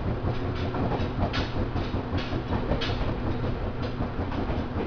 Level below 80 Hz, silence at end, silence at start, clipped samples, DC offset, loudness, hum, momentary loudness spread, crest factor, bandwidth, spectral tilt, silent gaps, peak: -34 dBFS; 0 s; 0 s; under 0.1%; under 0.1%; -30 LUFS; none; 3 LU; 16 dB; 5.4 kHz; -7.5 dB/octave; none; -12 dBFS